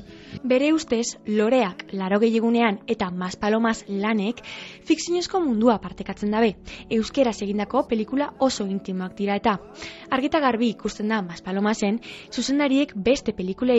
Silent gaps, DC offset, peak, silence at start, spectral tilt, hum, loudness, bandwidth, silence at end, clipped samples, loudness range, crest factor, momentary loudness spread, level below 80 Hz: none; under 0.1%; -4 dBFS; 0 s; -5 dB/octave; none; -23 LUFS; 8.2 kHz; 0 s; under 0.1%; 2 LU; 18 dB; 9 LU; -52 dBFS